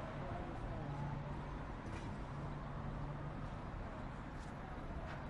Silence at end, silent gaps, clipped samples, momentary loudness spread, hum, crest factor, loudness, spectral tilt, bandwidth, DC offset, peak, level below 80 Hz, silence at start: 0 s; none; under 0.1%; 4 LU; none; 14 dB; -47 LUFS; -7.5 dB/octave; 11.5 kHz; under 0.1%; -32 dBFS; -52 dBFS; 0 s